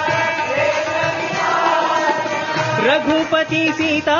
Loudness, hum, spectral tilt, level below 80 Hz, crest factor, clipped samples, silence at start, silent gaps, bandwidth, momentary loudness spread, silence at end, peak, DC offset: -17 LUFS; none; -4 dB/octave; -56 dBFS; 14 dB; under 0.1%; 0 s; none; 7.4 kHz; 4 LU; 0 s; -4 dBFS; under 0.1%